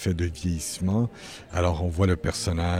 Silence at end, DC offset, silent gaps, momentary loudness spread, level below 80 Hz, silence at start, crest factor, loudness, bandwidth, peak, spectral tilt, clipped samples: 0 s; under 0.1%; none; 6 LU; -38 dBFS; 0 s; 16 dB; -27 LUFS; 15 kHz; -8 dBFS; -5.5 dB/octave; under 0.1%